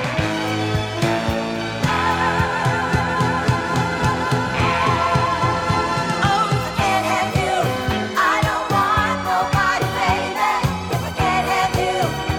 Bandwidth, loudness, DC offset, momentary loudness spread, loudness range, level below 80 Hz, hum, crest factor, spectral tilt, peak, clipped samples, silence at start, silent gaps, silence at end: 19 kHz; -19 LUFS; under 0.1%; 4 LU; 1 LU; -38 dBFS; none; 16 dB; -5 dB/octave; -4 dBFS; under 0.1%; 0 s; none; 0 s